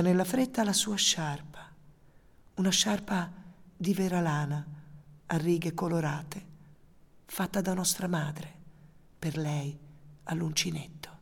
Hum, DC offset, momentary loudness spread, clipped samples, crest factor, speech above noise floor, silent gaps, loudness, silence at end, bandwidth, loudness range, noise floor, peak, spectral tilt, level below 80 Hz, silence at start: none; under 0.1%; 19 LU; under 0.1%; 18 dB; 28 dB; none; -30 LUFS; 0.05 s; 19 kHz; 5 LU; -58 dBFS; -12 dBFS; -4 dB/octave; -60 dBFS; 0 s